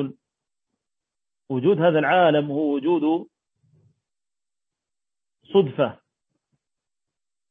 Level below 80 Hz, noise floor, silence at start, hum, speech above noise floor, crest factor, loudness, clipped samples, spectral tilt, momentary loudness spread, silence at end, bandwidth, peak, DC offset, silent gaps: -74 dBFS; under -90 dBFS; 0 s; none; over 70 dB; 18 dB; -21 LUFS; under 0.1%; -9.5 dB/octave; 9 LU; 1.55 s; 3.9 kHz; -6 dBFS; under 0.1%; none